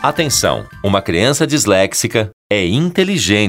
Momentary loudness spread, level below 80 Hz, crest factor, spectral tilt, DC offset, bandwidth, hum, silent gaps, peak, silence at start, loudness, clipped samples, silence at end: 5 LU; -42 dBFS; 14 dB; -4 dB/octave; 0.1%; 16.5 kHz; none; 2.33-2.50 s; 0 dBFS; 0 s; -14 LUFS; under 0.1%; 0 s